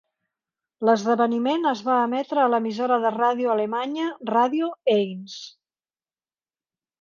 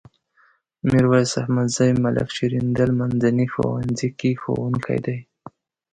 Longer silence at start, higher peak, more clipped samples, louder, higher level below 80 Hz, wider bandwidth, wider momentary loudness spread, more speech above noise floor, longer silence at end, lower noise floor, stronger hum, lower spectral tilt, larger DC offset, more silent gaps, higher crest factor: about the same, 0.8 s vs 0.85 s; about the same, -6 dBFS vs -4 dBFS; neither; about the same, -23 LUFS vs -21 LUFS; second, -76 dBFS vs -50 dBFS; second, 7.2 kHz vs 9.4 kHz; about the same, 8 LU vs 7 LU; first, over 68 dB vs 40 dB; first, 1.55 s vs 0.7 s; first, under -90 dBFS vs -60 dBFS; neither; about the same, -5.5 dB/octave vs -6.5 dB/octave; neither; neither; about the same, 18 dB vs 18 dB